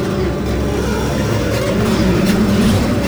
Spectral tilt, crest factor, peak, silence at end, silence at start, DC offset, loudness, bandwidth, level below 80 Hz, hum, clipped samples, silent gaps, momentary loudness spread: -6 dB/octave; 14 dB; -2 dBFS; 0 s; 0 s; under 0.1%; -16 LUFS; over 20 kHz; -26 dBFS; none; under 0.1%; none; 5 LU